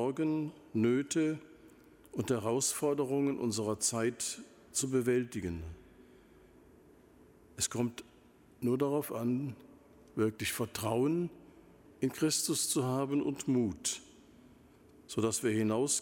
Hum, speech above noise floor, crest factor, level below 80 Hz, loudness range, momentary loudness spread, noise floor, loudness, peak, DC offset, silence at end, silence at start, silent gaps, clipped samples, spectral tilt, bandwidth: none; 29 dB; 18 dB; -64 dBFS; 5 LU; 10 LU; -61 dBFS; -33 LUFS; -18 dBFS; under 0.1%; 0 s; 0 s; none; under 0.1%; -4.5 dB/octave; 17 kHz